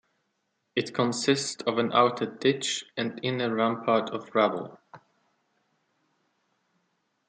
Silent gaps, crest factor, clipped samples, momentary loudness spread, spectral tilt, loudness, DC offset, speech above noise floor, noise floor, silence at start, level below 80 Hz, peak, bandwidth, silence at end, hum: none; 22 dB; under 0.1%; 8 LU; -4 dB/octave; -27 LUFS; under 0.1%; 50 dB; -77 dBFS; 0.75 s; -76 dBFS; -8 dBFS; 9.6 kHz; 2.3 s; none